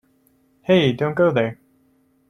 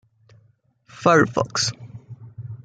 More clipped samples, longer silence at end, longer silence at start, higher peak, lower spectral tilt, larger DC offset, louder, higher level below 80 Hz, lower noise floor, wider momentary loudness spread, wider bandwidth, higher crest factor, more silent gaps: neither; first, 0.75 s vs 0.1 s; second, 0.7 s vs 0.95 s; about the same, -4 dBFS vs -4 dBFS; first, -7.5 dB/octave vs -4 dB/octave; neither; about the same, -19 LUFS vs -20 LUFS; about the same, -60 dBFS vs -60 dBFS; about the same, -61 dBFS vs -61 dBFS; second, 9 LU vs 24 LU; about the same, 9.8 kHz vs 9.4 kHz; about the same, 18 dB vs 20 dB; neither